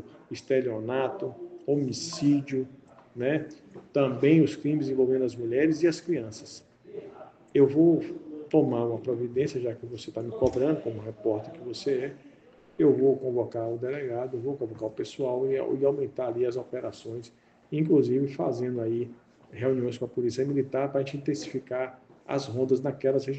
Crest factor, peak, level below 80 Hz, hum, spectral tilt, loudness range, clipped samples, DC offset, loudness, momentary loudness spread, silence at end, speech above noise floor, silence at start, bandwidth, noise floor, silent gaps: 18 dB; -10 dBFS; -64 dBFS; none; -7 dB/octave; 4 LU; under 0.1%; under 0.1%; -28 LUFS; 16 LU; 0 s; 29 dB; 0 s; 8.6 kHz; -56 dBFS; none